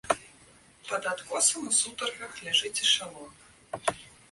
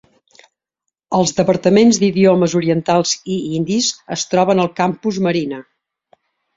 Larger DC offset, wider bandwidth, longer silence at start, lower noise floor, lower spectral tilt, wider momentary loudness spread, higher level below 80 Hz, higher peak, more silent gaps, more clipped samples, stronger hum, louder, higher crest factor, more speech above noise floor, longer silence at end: neither; first, 12 kHz vs 7.8 kHz; second, 0.05 s vs 1.1 s; second, -57 dBFS vs -79 dBFS; second, 0.5 dB/octave vs -5 dB/octave; first, 18 LU vs 9 LU; second, -66 dBFS vs -56 dBFS; second, -8 dBFS vs -2 dBFS; neither; neither; neither; second, -27 LUFS vs -16 LUFS; first, 22 dB vs 16 dB; second, 27 dB vs 64 dB; second, 0.2 s vs 0.95 s